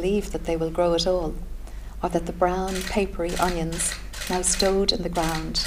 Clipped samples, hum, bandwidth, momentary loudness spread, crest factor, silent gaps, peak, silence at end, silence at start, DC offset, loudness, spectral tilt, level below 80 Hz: under 0.1%; none; 16 kHz; 11 LU; 18 dB; none; -6 dBFS; 0 s; 0 s; under 0.1%; -25 LUFS; -3.5 dB/octave; -34 dBFS